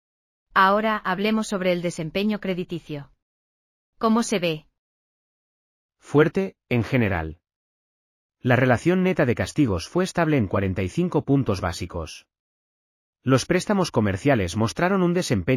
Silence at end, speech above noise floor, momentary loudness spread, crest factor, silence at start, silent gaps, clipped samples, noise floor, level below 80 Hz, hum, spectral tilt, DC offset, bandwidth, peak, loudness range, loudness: 0 s; over 68 dB; 11 LU; 20 dB; 0.55 s; 3.22-3.93 s, 4.79-5.89 s, 7.56-8.29 s, 12.40-13.13 s; under 0.1%; under -90 dBFS; -50 dBFS; none; -6 dB/octave; under 0.1%; 15.5 kHz; -4 dBFS; 5 LU; -23 LUFS